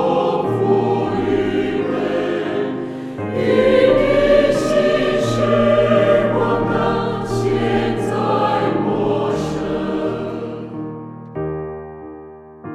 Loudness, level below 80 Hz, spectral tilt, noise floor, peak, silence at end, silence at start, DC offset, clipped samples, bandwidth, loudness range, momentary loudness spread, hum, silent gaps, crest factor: -18 LUFS; -40 dBFS; -6.5 dB/octave; -38 dBFS; -2 dBFS; 0 s; 0 s; under 0.1%; under 0.1%; 12.5 kHz; 8 LU; 14 LU; none; none; 16 dB